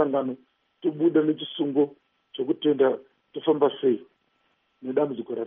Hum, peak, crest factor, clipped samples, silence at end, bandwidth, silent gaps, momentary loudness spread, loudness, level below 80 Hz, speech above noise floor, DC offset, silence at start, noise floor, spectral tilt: none; -8 dBFS; 18 dB; under 0.1%; 0 s; 3.8 kHz; none; 12 LU; -25 LUFS; -80 dBFS; 46 dB; under 0.1%; 0 s; -70 dBFS; -5 dB/octave